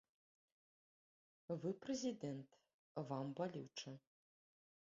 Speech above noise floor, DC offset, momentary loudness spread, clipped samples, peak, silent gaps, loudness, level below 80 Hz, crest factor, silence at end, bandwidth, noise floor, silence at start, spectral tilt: over 43 dB; under 0.1%; 13 LU; under 0.1%; -30 dBFS; 2.74-2.95 s; -48 LUFS; -88 dBFS; 20 dB; 0.95 s; 7.4 kHz; under -90 dBFS; 1.5 s; -6 dB/octave